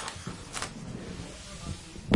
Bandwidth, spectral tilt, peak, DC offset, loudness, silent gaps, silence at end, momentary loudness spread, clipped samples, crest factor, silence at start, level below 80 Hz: 11.5 kHz; -4 dB/octave; -8 dBFS; under 0.1%; -39 LUFS; none; 0 s; 5 LU; under 0.1%; 26 dB; 0 s; -50 dBFS